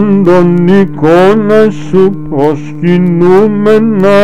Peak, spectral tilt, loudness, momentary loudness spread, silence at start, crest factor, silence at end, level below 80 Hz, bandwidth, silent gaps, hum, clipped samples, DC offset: 0 dBFS; -8.5 dB/octave; -7 LUFS; 5 LU; 0 s; 8 dB; 0 s; -40 dBFS; 10 kHz; none; none; under 0.1%; 8%